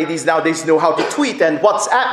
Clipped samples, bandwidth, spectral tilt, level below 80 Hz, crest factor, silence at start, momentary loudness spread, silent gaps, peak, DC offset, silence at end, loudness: under 0.1%; 13.5 kHz; -3.5 dB/octave; -64 dBFS; 16 dB; 0 s; 3 LU; none; 0 dBFS; under 0.1%; 0 s; -15 LUFS